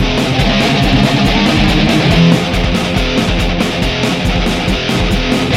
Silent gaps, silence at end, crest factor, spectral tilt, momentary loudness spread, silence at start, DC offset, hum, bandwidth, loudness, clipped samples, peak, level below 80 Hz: none; 0 s; 12 dB; -5.5 dB/octave; 4 LU; 0 s; under 0.1%; none; 15.5 kHz; -12 LUFS; under 0.1%; 0 dBFS; -20 dBFS